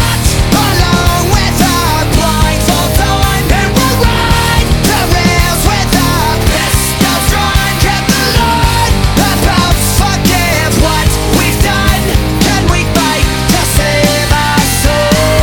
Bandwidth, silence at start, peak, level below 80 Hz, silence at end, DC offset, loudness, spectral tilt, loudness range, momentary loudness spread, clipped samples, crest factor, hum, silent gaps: over 20 kHz; 0 s; 0 dBFS; -16 dBFS; 0 s; under 0.1%; -10 LUFS; -4 dB/octave; 0 LU; 1 LU; 0.3%; 10 dB; none; none